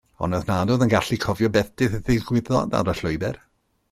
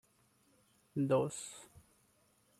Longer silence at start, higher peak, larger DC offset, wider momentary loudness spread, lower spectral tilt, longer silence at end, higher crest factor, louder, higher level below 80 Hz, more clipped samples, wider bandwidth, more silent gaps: second, 0.2 s vs 0.95 s; first, -6 dBFS vs -20 dBFS; neither; second, 7 LU vs 16 LU; about the same, -6.5 dB/octave vs -6 dB/octave; second, 0.55 s vs 0.95 s; about the same, 18 dB vs 20 dB; first, -23 LUFS vs -36 LUFS; first, -42 dBFS vs -76 dBFS; neither; about the same, 15.5 kHz vs 14.5 kHz; neither